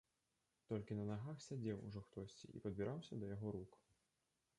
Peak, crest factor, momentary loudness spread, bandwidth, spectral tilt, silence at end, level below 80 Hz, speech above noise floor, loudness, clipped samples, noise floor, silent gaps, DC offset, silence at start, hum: -32 dBFS; 18 dB; 8 LU; 11 kHz; -7.5 dB/octave; 0.85 s; -72 dBFS; 40 dB; -49 LUFS; under 0.1%; -88 dBFS; none; under 0.1%; 0.7 s; none